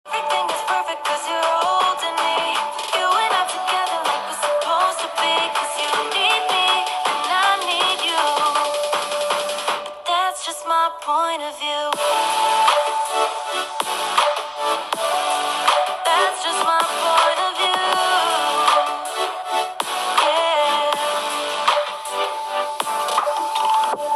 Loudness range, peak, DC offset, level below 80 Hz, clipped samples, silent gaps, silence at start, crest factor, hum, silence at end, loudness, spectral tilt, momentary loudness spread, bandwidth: 3 LU; 0 dBFS; under 0.1%; -70 dBFS; under 0.1%; none; 0.05 s; 20 dB; none; 0 s; -19 LUFS; 0.5 dB/octave; 6 LU; 14.5 kHz